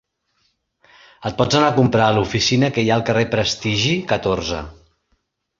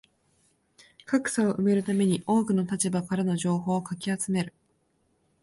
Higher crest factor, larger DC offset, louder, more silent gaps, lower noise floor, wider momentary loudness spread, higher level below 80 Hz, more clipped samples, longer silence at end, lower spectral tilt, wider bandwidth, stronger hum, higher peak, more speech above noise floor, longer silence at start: about the same, 18 dB vs 16 dB; neither; first, -18 LUFS vs -27 LUFS; neither; about the same, -68 dBFS vs -70 dBFS; first, 11 LU vs 6 LU; first, -44 dBFS vs -66 dBFS; neither; about the same, 0.85 s vs 0.95 s; about the same, -5 dB/octave vs -5.5 dB/octave; second, 7.6 kHz vs 11.5 kHz; neither; first, -2 dBFS vs -12 dBFS; first, 50 dB vs 45 dB; about the same, 1.2 s vs 1.1 s